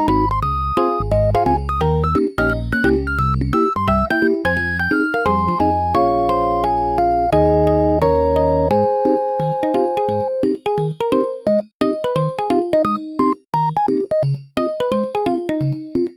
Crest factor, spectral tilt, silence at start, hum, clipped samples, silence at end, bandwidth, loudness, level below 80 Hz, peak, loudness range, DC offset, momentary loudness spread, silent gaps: 14 dB; -8 dB/octave; 0 s; none; under 0.1%; 0.05 s; 15.5 kHz; -18 LUFS; -32 dBFS; -4 dBFS; 3 LU; under 0.1%; 5 LU; 11.73-11.80 s